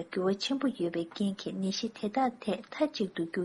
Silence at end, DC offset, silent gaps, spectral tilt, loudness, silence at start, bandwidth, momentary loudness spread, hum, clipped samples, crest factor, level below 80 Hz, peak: 0 s; under 0.1%; none; -5.5 dB/octave; -33 LUFS; 0 s; 11.5 kHz; 4 LU; none; under 0.1%; 18 dB; -72 dBFS; -14 dBFS